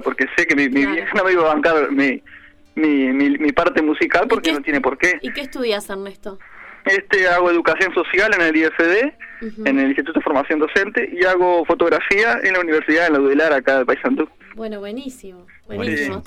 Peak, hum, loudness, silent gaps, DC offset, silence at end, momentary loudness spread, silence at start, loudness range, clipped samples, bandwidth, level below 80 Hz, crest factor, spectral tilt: -4 dBFS; none; -17 LUFS; none; under 0.1%; 0 s; 14 LU; 0 s; 3 LU; under 0.1%; 13.5 kHz; -48 dBFS; 14 dB; -4.5 dB/octave